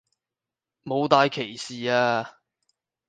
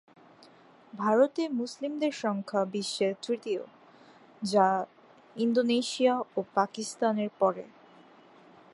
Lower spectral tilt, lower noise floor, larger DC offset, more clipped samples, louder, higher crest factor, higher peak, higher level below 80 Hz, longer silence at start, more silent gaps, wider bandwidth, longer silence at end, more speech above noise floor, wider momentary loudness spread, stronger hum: about the same, -4.5 dB/octave vs -4.5 dB/octave; first, -89 dBFS vs -56 dBFS; neither; neither; first, -24 LUFS vs -29 LUFS; about the same, 24 dB vs 20 dB; first, -2 dBFS vs -10 dBFS; first, -72 dBFS vs -82 dBFS; about the same, 0.85 s vs 0.95 s; neither; second, 9.6 kHz vs 11.5 kHz; second, 0.8 s vs 1.05 s; first, 66 dB vs 28 dB; first, 15 LU vs 12 LU; neither